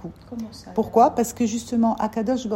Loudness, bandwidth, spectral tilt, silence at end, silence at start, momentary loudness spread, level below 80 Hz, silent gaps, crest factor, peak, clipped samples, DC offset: -22 LUFS; 16.5 kHz; -5.5 dB/octave; 0 s; 0 s; 17 LU; -52 dBFS; none; 18 dB; -4 dBFS; under 0.1%; under 0.1%